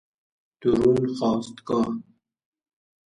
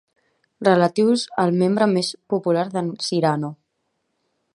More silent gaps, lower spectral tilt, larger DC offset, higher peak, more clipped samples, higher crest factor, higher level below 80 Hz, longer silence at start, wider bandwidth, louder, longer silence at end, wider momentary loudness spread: neither; first, -7.5 dB/octave vs -6 dB/octave; neither; second, -8 dBFS vs -2 dBFS; neither; about the same, 18 dB vs 20 dB; first, -54 dBFS vs -70 dBFS; about the same, 0.6 s vs 0.6 s; about the same, 11 kHz vs 11.5 kHz; second, -24 LUFS vs -20 LUFS; first, 1.15 s vs 1 s; about the same, 9 LU vs 8 LU